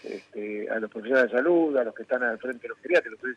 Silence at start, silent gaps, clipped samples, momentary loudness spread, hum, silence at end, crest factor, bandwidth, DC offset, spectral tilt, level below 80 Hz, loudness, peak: 0.05 s; none; under 0.1%; 13 LU; none; 0 s; 18 dB; 9 kHz; under 0.1%; -6 dB/octave; -80 dBFS; -26 LUFS; -8 dBFS